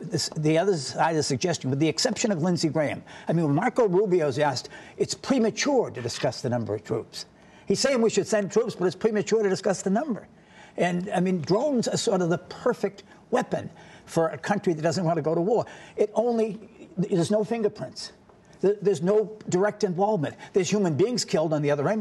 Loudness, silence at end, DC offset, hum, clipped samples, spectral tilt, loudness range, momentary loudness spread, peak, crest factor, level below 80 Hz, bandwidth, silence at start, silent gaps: -25 LUFS; 0 s; under 0.1%; none; under 0.1%; -5 dB/octave; 3 LU; 9 LU; -8 dBFS; 16 dB; -66 dBFS; 12.5 kHz; 0 s; none